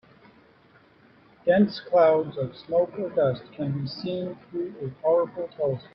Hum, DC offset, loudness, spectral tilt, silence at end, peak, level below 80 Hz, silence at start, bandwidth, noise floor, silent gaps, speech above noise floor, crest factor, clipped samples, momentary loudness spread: none; under 0.1%; -26 LUFS; -9.5 dB/octave; 0.15 s; -8 dBFS; -64 dBFS; 1.45 s; 5.8 kHz; -57 dBFS; none; 32 dB; 18 dB; under 0.1%; 12 LU